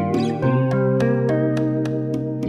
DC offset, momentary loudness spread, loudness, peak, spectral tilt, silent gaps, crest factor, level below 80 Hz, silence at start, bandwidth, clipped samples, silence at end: under 0.1%; 4 LU; -20 LUFS; -8 dBFS; -8.5 dB/octave; none; 12 dB; -52 dBFS; 0 s; 9.2 kHz; under 0.1%; 0 s